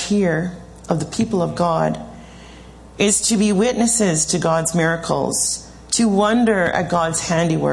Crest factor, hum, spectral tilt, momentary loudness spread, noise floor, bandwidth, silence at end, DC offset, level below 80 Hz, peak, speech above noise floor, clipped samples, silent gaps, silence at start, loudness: 16 dB; none; -4 dB/octave; 8 LU; -40 dBFS; 12 kHz; 0 s; under 0.1%; -44 dBFS; -2 dBFS; 22 dB; under 0.1%; none; 0 s; -18 LUFS